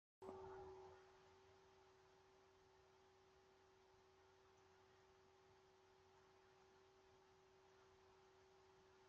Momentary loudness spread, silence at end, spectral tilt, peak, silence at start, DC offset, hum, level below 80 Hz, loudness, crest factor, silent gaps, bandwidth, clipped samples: 8 LU; 0 s; -4 dB/octave; -40 dBFS; 0.2 s; under 0.1%; none; -88 dBFS; -61 LUFS; 28 dB; none; 7.2 kHz; under 0.1%